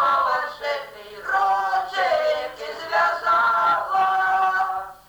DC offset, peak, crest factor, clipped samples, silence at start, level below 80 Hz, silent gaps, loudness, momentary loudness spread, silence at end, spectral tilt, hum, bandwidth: under 0.1%; -10 dBFS; 12 dB; under 0.1%; 0 s; -60 dBFS; none; -21 LUFS; 10 LU; 0.15 s; -2 dB/octave; none; over 20 kHz